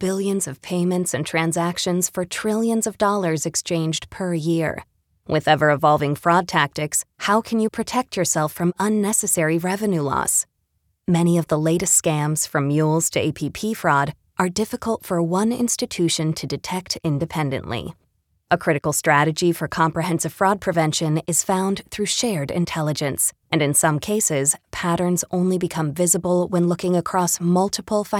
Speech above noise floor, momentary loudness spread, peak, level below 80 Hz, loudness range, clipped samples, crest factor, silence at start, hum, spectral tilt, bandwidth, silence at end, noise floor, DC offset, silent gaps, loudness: 49 dB; 7 LU; -4 dBFS; -54 dBFS; 3 LU; under 0.1%; 18 dB; 0 s; none; -4 dB/octave; 17.5 kHz; 0 s; -69 dBFS; under 0.1%; none; -21 LUFS